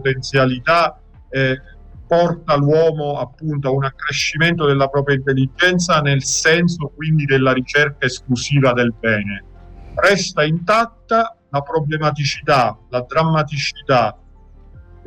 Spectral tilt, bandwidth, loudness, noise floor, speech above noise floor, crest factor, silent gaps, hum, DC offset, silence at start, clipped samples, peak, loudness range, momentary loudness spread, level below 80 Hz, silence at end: -5 dB/octave; 16 kHz; -17 LUFS; -43 dBFS; 26 dB; 12 dB; none; none; under 0.1%; 0 s; under 0.1%; -4 dBFS; 3 LU; 7 LU; -42 dBFS; 0.25 s